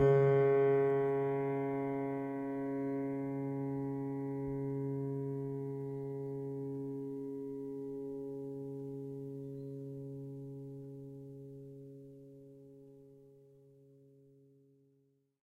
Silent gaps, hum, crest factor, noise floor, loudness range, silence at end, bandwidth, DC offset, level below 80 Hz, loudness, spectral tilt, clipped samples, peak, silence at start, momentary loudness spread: none; none; 18 dB; -74 dBFS; 19 LU; 2.1 s; 3.6 kHz; under 0.1%; -72 dBFS; -37 LUFS; -10 dB/octave; under 0.1%; -18 dBFS; 0 s; 21 LU